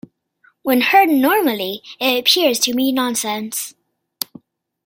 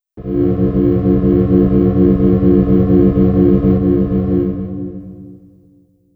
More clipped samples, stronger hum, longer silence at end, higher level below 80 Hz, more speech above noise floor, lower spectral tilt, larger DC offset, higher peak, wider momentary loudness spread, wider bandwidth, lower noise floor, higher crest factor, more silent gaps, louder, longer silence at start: neither; neither; first, 1.15 s vs 0.8 s; second, -68 dBFS vs -26 dBFS; about the same, 41 dB vs 39 dB; second, -1.5 dB/octave vs -13 dB/octave; neither; about the same, 0 dBFS vs 0 dBFS; first, 15 LU vs 11 LU; first, 17 kHz vs 3.4 kHz; first, -58 dBFS vs -50 dBFS; first, 18 dB vs 12 dB; neither; second, -16 LUFS vs -13 LUFS; first, 0.65 s vs 0.15 s